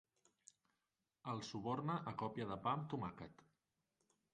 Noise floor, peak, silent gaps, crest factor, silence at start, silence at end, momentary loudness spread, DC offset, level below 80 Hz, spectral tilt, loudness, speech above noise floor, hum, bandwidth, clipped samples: under -90 dBFS; -26 dBFS; none; 22 dB; 1.25 s; 1 s; 11 LU; under 0.1%; -76 dBFS; -6.5 dB/octave; -45 LUFS; over 45 dB; none; 9.6 kHz; under 0.1%